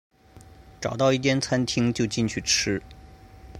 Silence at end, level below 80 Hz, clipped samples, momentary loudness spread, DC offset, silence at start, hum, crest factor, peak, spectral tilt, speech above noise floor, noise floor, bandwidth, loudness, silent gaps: 0 s; -50 dBFS; under 0.1%; 9 LU; under 0.1%; 0.35 s; none; 18 dB; -8 dBFS; -4 dB/octave; 26 dB; -50 dBFS; 15.5 kHz; -24 LUFS; none